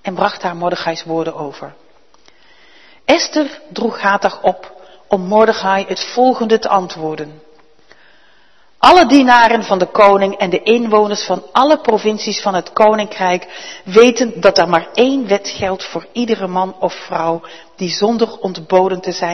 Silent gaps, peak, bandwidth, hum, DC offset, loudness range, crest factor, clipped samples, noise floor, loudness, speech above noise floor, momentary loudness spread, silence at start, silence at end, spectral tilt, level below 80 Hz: none; 0 dBFS; 12 kHz; none; 0.5%; 8 LU; 14 dB; 0.2%; -53 dBFS; -14 LUFS; 39 dB; 14 LU; 0.05 s; 0 s; -4.5 dB/octave; -52 dBFS